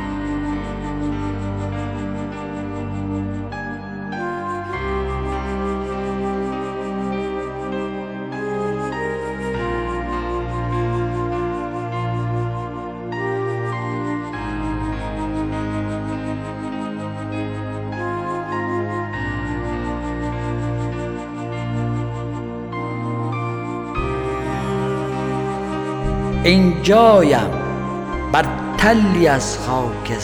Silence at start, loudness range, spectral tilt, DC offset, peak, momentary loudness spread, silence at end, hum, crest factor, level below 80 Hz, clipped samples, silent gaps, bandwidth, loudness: 0 s; 10 LU; -6.5 dB/octave; under 0.1%; 0 dBFS; 12 LU; 0 s; none; 20 dB; -34 dBFS; under 0.1%; none; 17.5 kHz; -22 LUFS